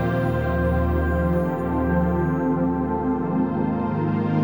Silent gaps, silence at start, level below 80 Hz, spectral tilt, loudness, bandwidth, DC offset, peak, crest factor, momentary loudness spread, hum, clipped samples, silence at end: none; 0 s; -32 dBFS; -10 dB/octave; -23 LUFS; 20 kHz; 0.4%; -10 dBFS; 12 dB; 2 LU; none; under 0.1%; 0 s